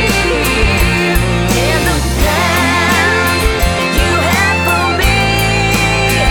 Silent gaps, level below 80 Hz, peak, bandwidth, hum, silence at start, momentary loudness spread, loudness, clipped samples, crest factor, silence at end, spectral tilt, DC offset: none; -20 dBFS; 0 dBFS; over 20 kHz; none; 0 s; 2 LU; -12 LUFS; under 0.1%; 12 dB; 0 s; -4 dB/octave; under 0.1%